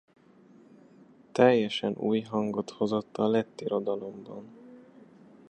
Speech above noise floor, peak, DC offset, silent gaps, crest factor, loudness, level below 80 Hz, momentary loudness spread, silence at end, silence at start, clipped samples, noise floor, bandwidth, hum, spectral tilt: 29 dB; -6 dBFS; under 0.1%; none; 24 dB; -28 LUFS; -74 dBFS; 20 LU; 0.7 s; 1.35 s; under 0.1%; -57 dBFS; 8.8 kHz; none; -6.5 dB/octave